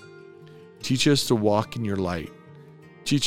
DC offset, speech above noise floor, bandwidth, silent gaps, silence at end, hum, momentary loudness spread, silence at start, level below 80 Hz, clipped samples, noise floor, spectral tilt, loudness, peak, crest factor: under 0.1%; 25 dB; 16.5 kHz; none; 0 s; none; 14 LU; 0 s; -58 dBFS; under 0.1%; -48 dBFS; -5 dB/octave; -24 LUFS; -6 dBFS; 18 dB